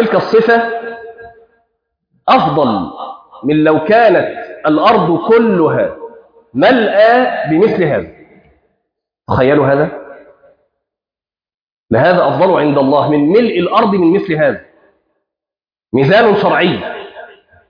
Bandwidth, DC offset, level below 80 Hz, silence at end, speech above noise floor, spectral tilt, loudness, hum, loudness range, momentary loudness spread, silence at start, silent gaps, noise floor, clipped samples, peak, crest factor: 5.2 kHz; under 0.1%; -48 dBFS; 0.45 s; over 80 dB; -8.5 dB/octave; -11 LUFS; none; 5 LU; 15 LU; 0 s; 11.54-11.84 s; under -90 dBFS; under 0.1%; 0 dBFS; 12 dB